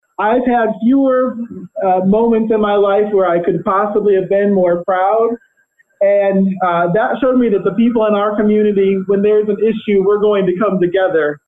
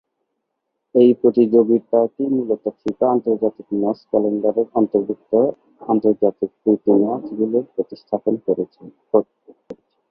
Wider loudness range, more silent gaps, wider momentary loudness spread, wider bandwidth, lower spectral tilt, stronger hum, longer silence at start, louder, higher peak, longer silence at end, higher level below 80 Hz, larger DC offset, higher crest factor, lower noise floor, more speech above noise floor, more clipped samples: about the same, 1 LU vs 3 LU; neither; second, 3 LU vs 9 LU; second, 3.9 kHz vs 5.4 kHz; about the same, -10 dB/octave vs -10.5 dB/octave; neither; second, 0.2 s vs 0.95 s; first, -14 LUFS vs -19 LUFS; about the same, -4 dBFS vs -2 dBFS; second, 0.1 s vs 0.4 s; first, -48 dBFS vs -64 dBFS; neither; second, 8 dB vs 16 dB; second, -57 dBFS vs -76 dBFS; second, 44 dB vs 58 dB; neither